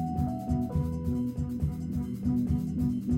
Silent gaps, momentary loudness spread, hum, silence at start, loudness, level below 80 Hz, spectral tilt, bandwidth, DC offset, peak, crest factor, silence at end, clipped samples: none; 4 LU; none; 0 s; -31 LUFS; -40 dBFS; -9.5 dB/octave; 16 kHz; under 0.1%; -18 dBFS; 12 dB; 0 s; under 0.1%